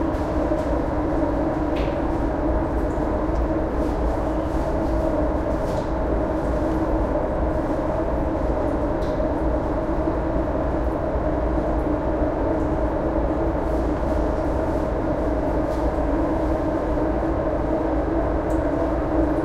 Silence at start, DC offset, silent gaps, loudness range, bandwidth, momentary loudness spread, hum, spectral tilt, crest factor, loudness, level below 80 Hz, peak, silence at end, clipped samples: 0 s; under 0.1%; none; 1 LU; 9 kHz; 1 LU; none; -8.5 dB/octave; 14 dB; -23 LUFS; -28 dBFS; -8 dBFS; 0 s; under 0.1%